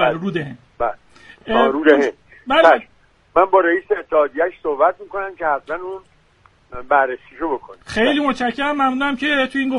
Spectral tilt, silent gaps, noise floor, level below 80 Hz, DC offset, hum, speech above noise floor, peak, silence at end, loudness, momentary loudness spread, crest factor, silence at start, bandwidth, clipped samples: -5.5 dB/octave; none; -54 dBFS; -50 dBFS; under 0.1%; none; 36 dB; 0 dBFS; 0 s; -18 LUFS; 14 LU; 18 dB; 0 s; 11 kHz; under 0.1%